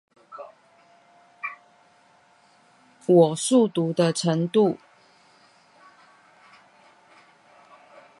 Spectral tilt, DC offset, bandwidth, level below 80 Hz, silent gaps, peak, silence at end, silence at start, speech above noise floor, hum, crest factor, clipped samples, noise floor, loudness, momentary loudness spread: -5.5 dB/octave; under 0.1%; 11.5 kHz; -76 dBFS; none; -4 dBFS; 3.45 s; 0.3 s; 38 dB; none; 22 dB; under 0.1%; -58 dBFS; -22 LUFS; 25 LU